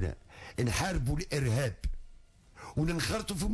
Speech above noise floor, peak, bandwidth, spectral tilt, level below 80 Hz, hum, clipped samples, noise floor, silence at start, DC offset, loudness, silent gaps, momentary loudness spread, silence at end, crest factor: 24 dB; -20 dBFS; 11 kHz; -5 dB/octave; -40 dBFS; none; under 0.1%; -55 dBFS; 0 s; under 0.1%; -33 LUFS; none; 13 LU; 0 s; 12 dB